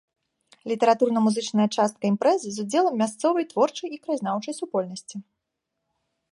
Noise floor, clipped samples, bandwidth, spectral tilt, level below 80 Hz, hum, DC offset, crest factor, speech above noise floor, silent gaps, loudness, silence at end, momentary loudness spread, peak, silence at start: -82 dBFS; under 0.1%; 11.5 kHz; -5 dB/octave; -78 dBFS; none; under 0.1%; 18 dB; 58 dB; none; -24 LUFS; 1.1 s; 13 LU; -6 dBFS; 0.65 s